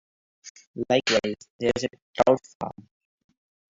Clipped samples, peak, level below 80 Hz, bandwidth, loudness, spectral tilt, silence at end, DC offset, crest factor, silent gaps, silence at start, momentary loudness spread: under 0.1%; -4 dBFS; -58 dBFS; 7.8 kHz; -25 LUFS; -4 dB/octave; 1.05 s; under 0.1%; 22 dB; 0.50-0.55 s, 0.67-0.74 s, 1.50-1.59 s, 2.02-2.14 s, 2.55-2.60 s; 0.45 s; 15 LU